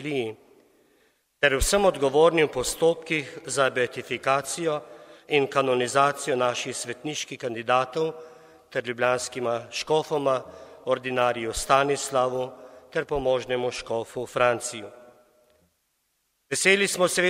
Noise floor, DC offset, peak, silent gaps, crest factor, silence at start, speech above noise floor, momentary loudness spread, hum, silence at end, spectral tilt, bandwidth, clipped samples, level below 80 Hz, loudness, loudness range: -73 dBFS; under 0.1%; -4 dBFS; none; 22 dB; 0 s; 48 dB; 11 LU; none; 0 s; -3 dB/octave; 16 kHz; under 0.1%; -46 dBFS; -25 LUFS; 5 LU